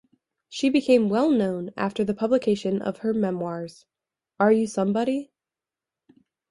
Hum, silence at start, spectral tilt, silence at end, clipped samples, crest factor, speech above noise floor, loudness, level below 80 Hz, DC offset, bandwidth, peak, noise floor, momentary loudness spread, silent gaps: none; 0.5 s; -6.5 dB/octave; 1.25 s; under 0.1%; 18 dB; 67 dB; -24 LUFS; -66 dBFS; under 0.1%; 11.5 kHz; -6 dBFS; -90 dBFS; 11 LU; none